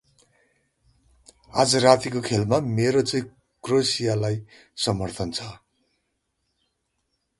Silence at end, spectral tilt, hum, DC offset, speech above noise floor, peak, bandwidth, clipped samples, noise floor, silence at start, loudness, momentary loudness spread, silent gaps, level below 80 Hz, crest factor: 1.85 s; -4.5 dB/octave; none; under 0.1%; 53 dB; 0 dBFS; 11.5 kHz; under 0.1%; -75 dBFS; 1.55 s; -23 LUFS; 15 LU; none; -54 dBFS; 24 dB